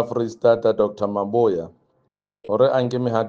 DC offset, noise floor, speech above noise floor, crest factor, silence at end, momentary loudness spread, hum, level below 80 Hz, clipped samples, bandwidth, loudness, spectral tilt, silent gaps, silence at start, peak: under 0.1%; -69 dBFS; 49 dB; 18 dB; 0 s; 8 LU; none; -62 dBFS; under 0.1%; 7.4 kHz; -20 LUFS; -7.5 dB/octave; none; 0 s; -4 dBFS